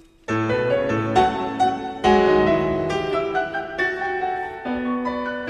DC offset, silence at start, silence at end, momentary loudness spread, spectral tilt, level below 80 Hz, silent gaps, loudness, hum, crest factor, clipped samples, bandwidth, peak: under 0.1%; 0.3 s; 0 s; 9 LU; -6 dB/octave; -46 dBFS; none; -21 LUFS; none; 18 dB; under 0.1%; 9.8 kHz; -4 dBFS